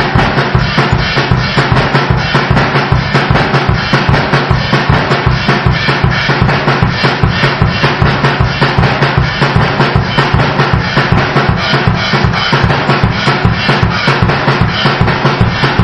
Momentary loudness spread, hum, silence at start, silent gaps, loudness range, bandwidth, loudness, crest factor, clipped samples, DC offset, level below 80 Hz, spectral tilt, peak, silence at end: 1 LU; none; 0 s; none; 0 LU; 9.4 kHz; -10 LUFS; 10 dB; 0.1%; 0.3%; -22 dBFS; -6.5 dB/octave; 0 dBFS; 0 s